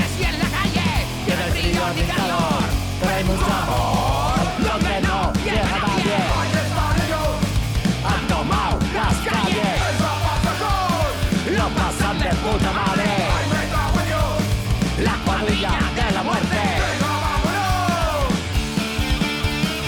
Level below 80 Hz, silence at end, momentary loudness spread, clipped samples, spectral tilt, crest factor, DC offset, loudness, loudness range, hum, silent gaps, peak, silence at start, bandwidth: -28 dBFS; 0 s; 2 LU; under 0.1%; -5 dB/octave; 10 dB; under 0.1%; -20 LUFS; 1 LU; none; none; -10 dBFS; 0 s; 19 kHz